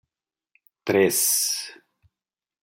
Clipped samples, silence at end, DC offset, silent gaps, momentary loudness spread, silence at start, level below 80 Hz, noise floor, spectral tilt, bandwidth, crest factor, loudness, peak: under 0.1%; 0.9 s; under 0.1%; none; 15 LU; 0.85 s; -72 dBFS; under -90 dBFS; -2 dB/octave; 16.5 kHz; 18 dB; -21 LUFS; -8 dBFS